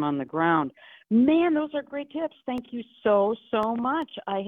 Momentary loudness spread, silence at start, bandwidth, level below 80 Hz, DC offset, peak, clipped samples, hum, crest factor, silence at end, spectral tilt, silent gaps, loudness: 13 LU; 0 s; 4.2 kHz; -66 dBFS; under 0.1%; -8 dBFS; under 0.1%; none; 16 dB; 0 s; -8.5 dB/octave; none; -26 LUFS